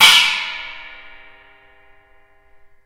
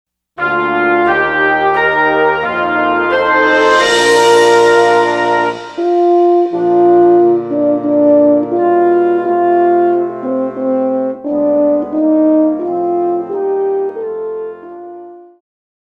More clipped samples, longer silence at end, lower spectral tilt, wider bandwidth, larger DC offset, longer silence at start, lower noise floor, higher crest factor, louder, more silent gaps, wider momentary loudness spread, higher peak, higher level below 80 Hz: neither; first, 2 s vs 0.7 s; second, 2.5 dB/octave vs -4.5 dB/octave; first, 16 kHz vs 12 kHz; neither; second, 0 s vs 0.4 s; first, -51 dBFS vs -33 dBFS; first, 20 dB vs 12 dB; about the same, -14 LUFS vs -12 LUFS; neither; first, 27 LU vs 9 LU; about the same, 0 dBFS vs 0 dBFS; about the same, -54 dBFS vs -52 dBFS